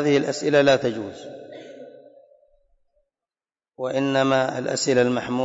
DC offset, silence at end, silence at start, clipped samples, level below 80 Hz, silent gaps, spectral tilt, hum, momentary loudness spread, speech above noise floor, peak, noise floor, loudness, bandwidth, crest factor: under 0.1%; 0 s; 0 s; under 0.1%; -64 dBFS; none; -4.5 dB/octave; none; 22 LU; over 69 dB; -8 dBFS; under -90 dBFS; -21 LUFS; 8 kHz; 16 dB